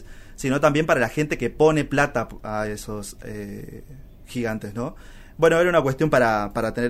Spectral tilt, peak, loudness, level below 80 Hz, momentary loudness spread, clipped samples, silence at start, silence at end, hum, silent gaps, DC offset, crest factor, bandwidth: -6 dB/octave; -4 dBFS; -22 LUFS; -42 dBFS; 16 LU; under 0.1%; 0 s; 0 s; none; none; under 0.1%; 18 dB; 15.5 kHz